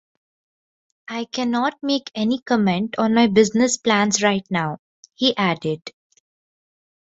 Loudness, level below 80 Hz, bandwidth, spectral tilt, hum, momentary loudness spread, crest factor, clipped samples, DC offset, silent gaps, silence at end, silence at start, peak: -20 LUFS; -62 dBFS; 8 kHz; -4 dB/octave; none; 12 LU; 18 dB; under 0.1%; under 0.1%; 2.42-2.46 s, 4.79-5.03 s; 1.15 s; 1.1 s; -2 dBFS